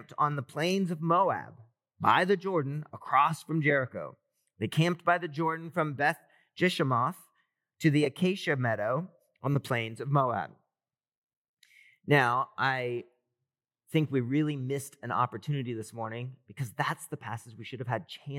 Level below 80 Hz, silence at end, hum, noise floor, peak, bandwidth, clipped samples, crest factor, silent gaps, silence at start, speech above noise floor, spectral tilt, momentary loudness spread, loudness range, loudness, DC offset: -88 dBFS; 0 s; none; under -90 dBFS; -8 dBFS; 16 kHz; under 0.1%; 22 dB; 11.17-11.22 s, 11.37-11.57 s; 0 s; over 60 dB; -6 dB/octave; 14 LU; 5 LU; -30 LUFS; under 0.1%